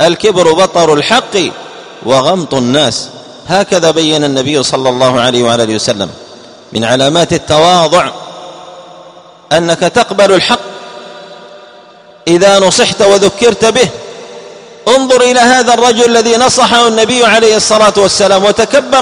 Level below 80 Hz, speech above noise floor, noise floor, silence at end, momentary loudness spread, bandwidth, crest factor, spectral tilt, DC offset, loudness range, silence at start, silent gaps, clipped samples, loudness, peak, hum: -44 dBFS; 29 dB; -37 dBFS; 0 s; 17 LU; 12.5 kHz; 10 dB; -3 dB/octave; under 0.1%; 5 LU; 0 s; none; 0.8%; -8 LUFS; 0 dBFS; none